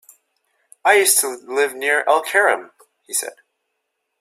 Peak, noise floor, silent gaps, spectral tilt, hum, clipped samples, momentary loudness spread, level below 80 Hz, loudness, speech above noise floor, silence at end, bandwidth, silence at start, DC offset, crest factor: 0 dBFS; -75 dBFS; none; 1 dB/octave; none; under 0.1%; 11 LU; -76 dBFS; -17 LUFS; 57 dB; 0.9 s; 16 kHz; 0.85 s; under 0.1%; 20 dB